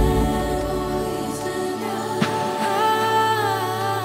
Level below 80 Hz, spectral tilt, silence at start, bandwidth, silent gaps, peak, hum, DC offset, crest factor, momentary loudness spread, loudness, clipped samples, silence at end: -34 dBFS; -5 dB/octave; 0 s; 16 kHz; none; -6 dBFS; none; under 0.1%; 16 dB; 7 LU; -22 LUFS; under 0.1%; 0 s